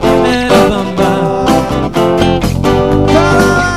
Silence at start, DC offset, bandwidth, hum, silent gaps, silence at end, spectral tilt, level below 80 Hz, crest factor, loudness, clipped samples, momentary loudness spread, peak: 0 s; 2%; 15.5 kHz; none; none; 0 s; -6 dB/octave; -24 dBFS; 10 dB; -10 LUFS; 0.6%; 4 LU; 0 dBFS